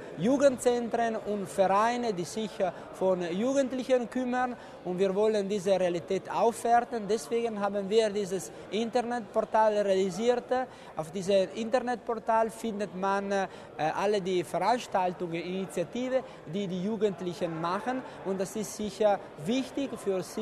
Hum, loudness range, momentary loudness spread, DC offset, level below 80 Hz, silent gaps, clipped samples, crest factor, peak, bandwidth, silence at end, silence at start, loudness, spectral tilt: none; 3 LU; 9 LU; under 0.1%; -66 dBFS; none; under 0.1%; 18 dB; -12 dBFS; 13 kHz; 0 s; 0 s; -30 LUFS; -5 dB/octave